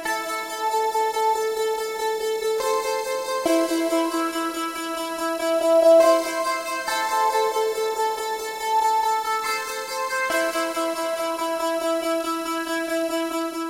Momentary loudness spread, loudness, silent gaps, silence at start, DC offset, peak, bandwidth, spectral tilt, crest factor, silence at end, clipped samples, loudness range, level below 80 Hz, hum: 6 LU; -23 LUFS; none; 0 s; under 0.1%; -6 dBFS; 16 kHz; -1.5 dB/octave; 16 dB; 0 s; under 0.1%; 4 LU; -62 dBFS; none